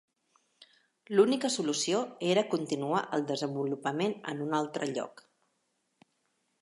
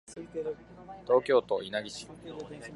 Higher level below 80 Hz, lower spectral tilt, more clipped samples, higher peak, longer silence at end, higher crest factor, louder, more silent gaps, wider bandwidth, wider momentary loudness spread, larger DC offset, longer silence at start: second, -84 dBFS vs -64 dBFS; about the same, -4.5 dB/octave vs -4.5 dB/octave; neither; about the same, -12 dBFS vs -12 dBFS; first, 1.5 s vs 0 s; about the same, 22 dB vs 20 dB; about the same, -31 LUFS vs -30 LUFS; neither; about the same, 11.5 kHz vs 11.5 kHz; second, 8 LU vs 19 LU; neither; first, 0.6 s vs 0.1 s